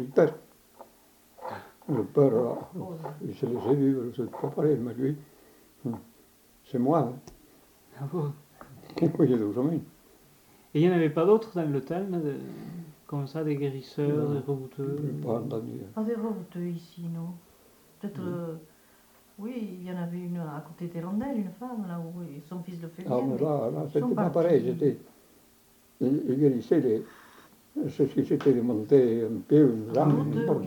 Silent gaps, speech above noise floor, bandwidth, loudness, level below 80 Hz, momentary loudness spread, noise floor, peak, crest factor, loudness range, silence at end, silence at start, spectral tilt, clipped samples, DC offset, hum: none; 33 dB; 19 kHz; -28 LUFS; -70 dBFS; 16 LU; -60 dBFS; -8 dBFS; 20 dB; 10 LU; 0 s; 0 s; -9 dB/octave; under 0.1%; under 0.1%; none